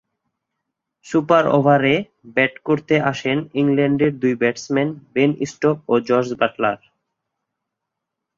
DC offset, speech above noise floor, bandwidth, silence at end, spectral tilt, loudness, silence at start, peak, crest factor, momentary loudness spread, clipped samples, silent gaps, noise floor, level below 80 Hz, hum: under 0.1%; 63 dB; 7.6 kHz; 1.6 s; -6.5 dB/octave; -19 LUFS; 1.05 s; -2 dBFS; 18 dB; 7 LU; under 0.1%; none; -81 dBFS; -60 dBFS; none